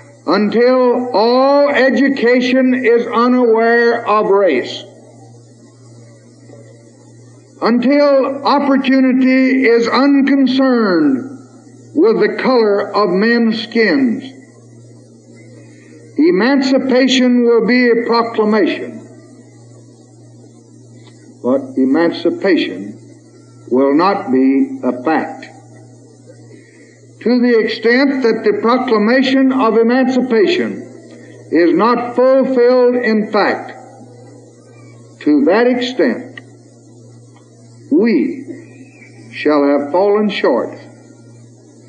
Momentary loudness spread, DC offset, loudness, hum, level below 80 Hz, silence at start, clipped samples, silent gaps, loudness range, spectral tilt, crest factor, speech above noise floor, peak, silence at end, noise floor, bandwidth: 10 LU; under 0.1%; -13 LUFS; none; -82 dBFS; 0.25 s; under 0.1%; none; 7 LU; -6 dB/octave; 14 dB; 30 dB; 0 dBFS; 1 s; -42 dBFS; 8.4 kHz